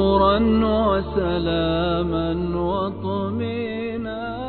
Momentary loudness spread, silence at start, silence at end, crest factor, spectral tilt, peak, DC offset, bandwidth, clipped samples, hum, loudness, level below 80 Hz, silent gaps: 10 LU; 0 s; 0 s; 14 dB; -10.5 dB/octave; -6 dBFS; under 0.1%; 4.5 kHz; under 0.1%; none; -22 LUFS; -34 dBFS; none